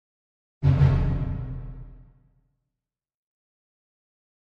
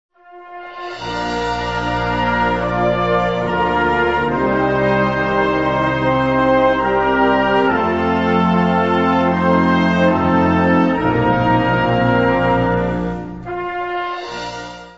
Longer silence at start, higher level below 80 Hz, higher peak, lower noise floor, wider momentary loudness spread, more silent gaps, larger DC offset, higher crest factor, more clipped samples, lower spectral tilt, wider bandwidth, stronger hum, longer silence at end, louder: first, 0.6 s vs 0.3 s; about the same, -36 dBFS vs -36 dBFS; second, -8 dBFS vs -2 dBFS; first, -88 dBFS vs -37 dBFS; first, 21 LU vs 10 LU; neither; second, under 0.1% vs 0.5%; first, 20 dB vs 14 dB; neither; first, -10 dB/octave vs -7 dB/octave; second, 5.2 kHz vs 7.8 kHz; neither; first, 2.55 s vs 0 s; second, -24 LUFS vs -16 LUFS